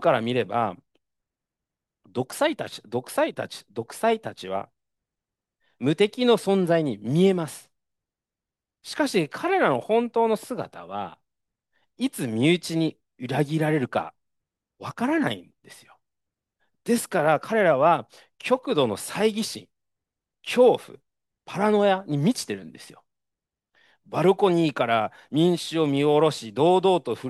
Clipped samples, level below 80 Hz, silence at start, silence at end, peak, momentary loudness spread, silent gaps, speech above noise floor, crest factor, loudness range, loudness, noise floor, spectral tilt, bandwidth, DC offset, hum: under 0.1%; -72 dBFS; 0 s; 0 s; -6 dBFS; 15 LU; none; 66 dB; 18 dB; 5 LU; -24 LUFS; -89 dBFS; -5.5 dB/octave; 12.5 kHz; under 0.1%; none